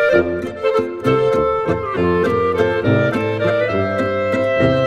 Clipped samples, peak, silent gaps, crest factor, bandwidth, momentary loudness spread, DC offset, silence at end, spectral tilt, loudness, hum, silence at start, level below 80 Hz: under 0.1%; -2 dBFS; none; 14 dB; 12 kHz; 3 LU; under 0.1%; 0 s; -7.5 dB/octave; -17 LUFS; none; 0 s; -42 dBFS